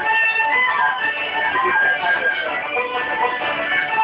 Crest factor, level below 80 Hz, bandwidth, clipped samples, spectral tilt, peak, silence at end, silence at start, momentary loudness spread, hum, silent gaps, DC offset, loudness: 12 dB; -60 dBFS; 9.4 kHz; under 0.1%; -4.5 dB/octave; -6 dBFS; 0 s; 0 s; 6 LU; none; none; under 0.1%; -18 LUFS